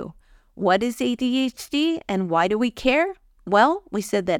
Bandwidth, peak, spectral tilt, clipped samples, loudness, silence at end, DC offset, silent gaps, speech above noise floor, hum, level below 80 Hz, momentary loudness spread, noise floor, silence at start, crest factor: 18 kHz; -4 dBFS; -5 dB/octave; under 0.1%; -22 LUFS; 0 s; under 0.1%; none; 26 dB; none; -52 dBFS; 8 LU; -47 dBFS; 0 s; 18 dB